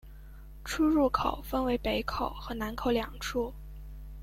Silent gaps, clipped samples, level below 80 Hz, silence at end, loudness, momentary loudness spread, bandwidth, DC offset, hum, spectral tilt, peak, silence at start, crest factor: none; under 0.1%; -44 dBFS; 0 s; -31 LUFS; 21 LU; 16.5 kHz; under 0.1%; none; -5 dB/octave; -12 dBFS; 0.05 s; 20 dB